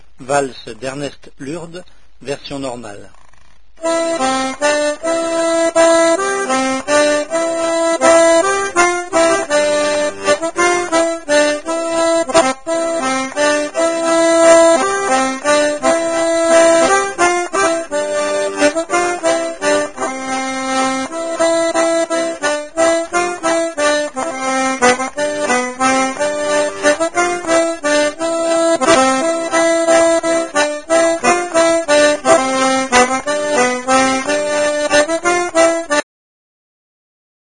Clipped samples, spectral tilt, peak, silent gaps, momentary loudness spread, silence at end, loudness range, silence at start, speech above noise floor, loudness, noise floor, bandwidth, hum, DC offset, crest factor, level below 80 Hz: under 0.1%; -2 dB/octave; 0 dBFS; none; 8 LU; 1.4 s; 4 LU; 0.2 s; 31 dB; -14 LUFS; -50 dBFS; 10.5 kHz; none; 1%; 14 dB; -50 dBFS